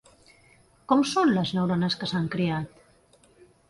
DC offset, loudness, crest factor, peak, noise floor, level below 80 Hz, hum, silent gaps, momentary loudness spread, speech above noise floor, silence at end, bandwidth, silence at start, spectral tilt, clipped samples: under 0.1%; -25 LUFS; 18 dB; -8 dBFS; -59 dBFS; -60 dBFS; none; none; 6 LU; 35 dB; 1 s; 11.5 kHz; 0.9 s; -6 dB/octave; under 0.1%